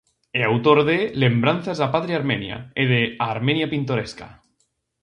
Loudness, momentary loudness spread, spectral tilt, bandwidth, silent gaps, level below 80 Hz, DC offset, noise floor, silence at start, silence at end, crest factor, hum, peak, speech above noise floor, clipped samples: -21 LUFS; 10 LU; -7 dB/octave; 10 kHz; none; -56 dBFS; under 0.1%; -70 dBFS; 0.35 s; 0.7 s; 20 dB; none; -2 dBFS; 49 dB; under 0.1%